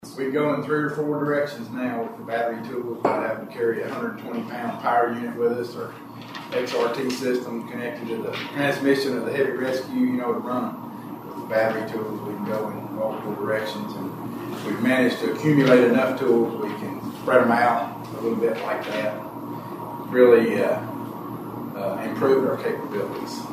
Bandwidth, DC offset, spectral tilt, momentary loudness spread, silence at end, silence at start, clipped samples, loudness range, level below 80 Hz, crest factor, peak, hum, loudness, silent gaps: 15.5 kHz; under 0.1%; -6 dB/octave; 14 LU; 0 s; 0 s; under 0.1%; 7 LU; -68 dBFS; 22 dB; -2 dBFS; none; -24 LUFS; none